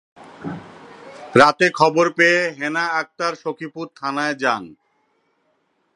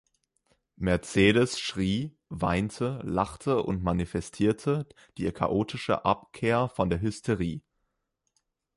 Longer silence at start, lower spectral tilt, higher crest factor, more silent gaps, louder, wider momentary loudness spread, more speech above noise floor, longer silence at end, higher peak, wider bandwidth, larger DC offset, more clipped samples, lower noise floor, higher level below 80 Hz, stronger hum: second, 0.2 s vs 0.8 s; second, -4.5 dB/octave vs -6 dB/octave; about the same, 20 dB vs 20 dB; neither; first, -18 LUFS vs -28 LUFS; first, 19 LU vs 9 LU; second, 47 dB vs 52 dB; about the same, 1.25 s vs 1.15 s; first, 0 dBFS vs -8 dBFS; about the same, 11.5 kHz vs 11.5 kHz; neither; neither; second, -66 dBFS vs -80 dBFS; second, -64 dBFS vs -48 dBFS; neither